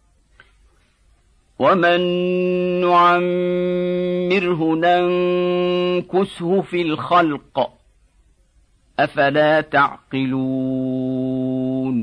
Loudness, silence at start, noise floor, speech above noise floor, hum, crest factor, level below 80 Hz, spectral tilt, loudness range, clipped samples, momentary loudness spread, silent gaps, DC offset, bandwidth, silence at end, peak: -18 LUFS; 1.6 s; -57 dBFS; 39 dB; none; 16 dB; -56 dBFS; -7.5 dB/octave; 3 LU; under 0.1%; 7 LU; none; under 0.1%; 9.8 kHz; 0 s; -4 dBFS